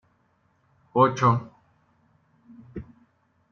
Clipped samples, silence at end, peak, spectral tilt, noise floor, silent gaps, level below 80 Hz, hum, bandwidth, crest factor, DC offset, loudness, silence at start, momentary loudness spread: under 0.1%; 0.7 s; -6 dBFS; -6.5 dB/octave; -67 dBFS; none; -60 dBFS; none; 7 kHz; 22 dB; under 0.1%; -22 LUFS; 0.95 s; 23 LU